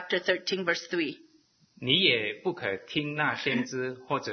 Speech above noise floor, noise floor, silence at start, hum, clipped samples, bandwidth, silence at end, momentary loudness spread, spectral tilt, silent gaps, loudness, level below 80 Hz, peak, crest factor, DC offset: 33 dB; -62 dBFS; 0 s; none; under 0.1%; 6.6 kHz; 0 s; 11 LU; -4 dB/octave; none; -28 LUFS; -72 dBFS; -8 dBFS; 22 dB; under 0.1%